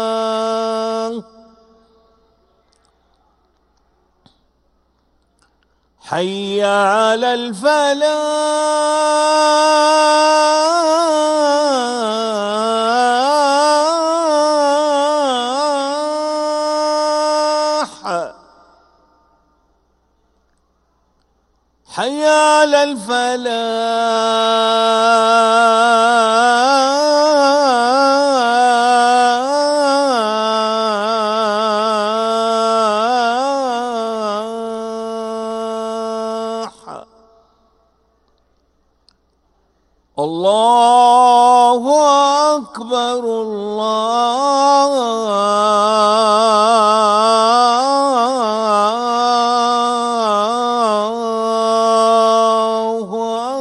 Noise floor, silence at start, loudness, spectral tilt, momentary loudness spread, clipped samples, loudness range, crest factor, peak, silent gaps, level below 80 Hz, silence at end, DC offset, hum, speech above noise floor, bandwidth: -61 dBFS; 0 s; -14 LUFS; -2.5 dB/octave; 10 LU; under 0.1%; 12 LU; 14 dB; 0 dBFS; none; -62 dBFS; 0 s; under 0.1%; none; 47 dB; 12 kHz